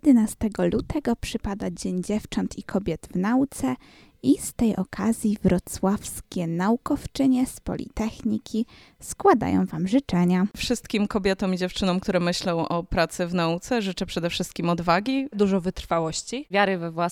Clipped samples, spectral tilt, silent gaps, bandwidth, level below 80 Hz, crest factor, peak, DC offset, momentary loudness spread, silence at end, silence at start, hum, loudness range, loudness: under 0.1%; -5.5 dB/octave; none; 16 kHz; -44 dBFS; 18 dB; -6 dBFS; under 0.1%; 7 LU; 0 s; 0.05 s; none; 3 LU; -25 LUFS